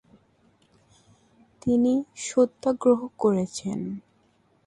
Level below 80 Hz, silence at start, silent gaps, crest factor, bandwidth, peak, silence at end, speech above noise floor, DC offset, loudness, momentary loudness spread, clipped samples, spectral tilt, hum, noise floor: -62 dBFS; 1.65 s; none; 18 dB; 11 kHz; -8 dBFS; 0.7 s; 41 dB; under 0.1%; -25 LUFS; 11 LU; under 0.1%; -6 dB/octave; none; -64 dBFS